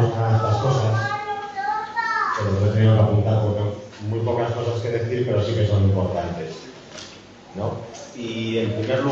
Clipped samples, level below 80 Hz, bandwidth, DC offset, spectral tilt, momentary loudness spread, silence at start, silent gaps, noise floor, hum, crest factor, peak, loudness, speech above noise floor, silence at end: under 0.1%; -52 dBFS; 7.4 kHz; under 0.1%; -7 dB/octave; 16 LU; 0 s; none; -43 dBFS; none; 14 dB; -6 dBFS; -22 LUFS; 21 dB; 0 s